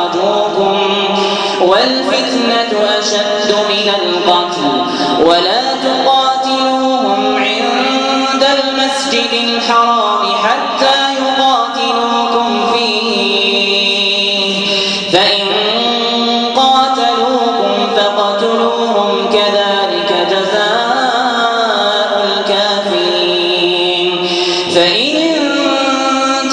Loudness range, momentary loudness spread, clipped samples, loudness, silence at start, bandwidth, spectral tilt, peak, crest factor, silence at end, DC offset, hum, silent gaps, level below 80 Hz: 1 LU; 3 LU; under 0.1%; -11 LUFS; 0 s; 10.5 kHz; -3 dB/octave; 0 dBFS; 12 dB; 0 s; under 0.1%; none; none; -56 dBFS